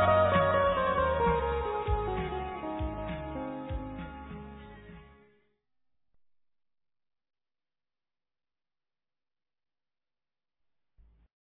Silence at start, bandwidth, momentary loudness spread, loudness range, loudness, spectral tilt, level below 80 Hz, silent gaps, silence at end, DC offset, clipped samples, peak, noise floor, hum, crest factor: 0 s; 4 kHz; 20 LU; 20 LU; -30 LUFS; -10 dB/octave; -46 dBFS; none; 6.5 s; under 0.1%; under 0.1%; -12 dBFS; under -90 dBFS; none; 22 dB